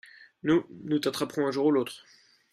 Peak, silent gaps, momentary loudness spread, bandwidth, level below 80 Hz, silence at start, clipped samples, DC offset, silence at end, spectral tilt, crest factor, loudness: -12 dBFS; none; 10 LU; 15 kHz; -68 dBFS; 0.45 s; under 0.1%; under 0.1%; 0.55 s; -5.5 dB/octave; 16 dB; -28 LUFS